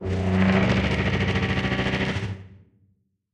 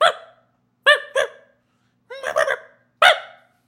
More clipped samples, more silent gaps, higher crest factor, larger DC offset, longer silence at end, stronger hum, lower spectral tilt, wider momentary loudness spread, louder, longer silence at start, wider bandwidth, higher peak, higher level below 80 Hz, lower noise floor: neither; neither; second, 16 dB vs 22 dB; neither; first, 0.8 s vs 0.4 s; neither; first, -6.5 dB/octave vs 1 dB/octave; second, 9 LU vs 15 LU; second, -23 LUFS vs -18 LUFS; about the same, 0 s vs 0 s; second, 9 kHz vs 16.5 kHz; second, -8 dBFS vs 0 dBFS; first, -38 dBFS vs -72 dBFS; about the same, -66 dBFS vs -66 dBFS